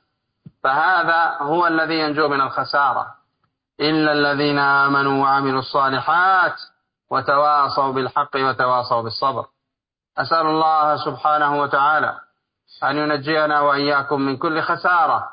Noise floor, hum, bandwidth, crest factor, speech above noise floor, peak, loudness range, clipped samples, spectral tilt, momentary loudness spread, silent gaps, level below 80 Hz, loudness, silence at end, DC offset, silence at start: -84 dBFS; none; 5.2 kHz; 14 dB; 66 dB; -4 dBFS; 2 LU; under 0.1%; -10 dB/octave; 7 LU; none; -64 dBFS; -18 LUFS; 0 s; under 0.1%; 0.65 s